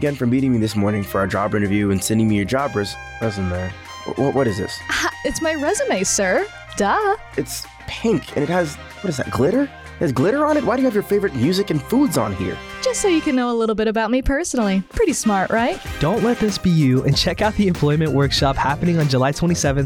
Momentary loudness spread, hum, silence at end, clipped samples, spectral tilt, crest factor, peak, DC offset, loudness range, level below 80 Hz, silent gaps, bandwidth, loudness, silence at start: 8 LU; none; 0 s; under 0.1%; -5 dB/octave; 12 dB; -6 dBFS; under 0.1%; 4 LU; -38 dBFS; none; 19.5 kHz; -19 LUFS; 0 s